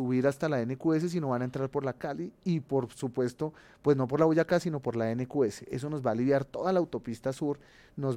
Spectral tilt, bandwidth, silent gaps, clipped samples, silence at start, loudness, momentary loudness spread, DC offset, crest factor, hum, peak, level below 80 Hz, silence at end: -7.5 dB/octave; 15 kHz; none; under 0.1%; 0 s; -30 LUFS; 9 LU; under 0.1%; 18 dB; none; -12 dBFS; -64 dBFS; 0 s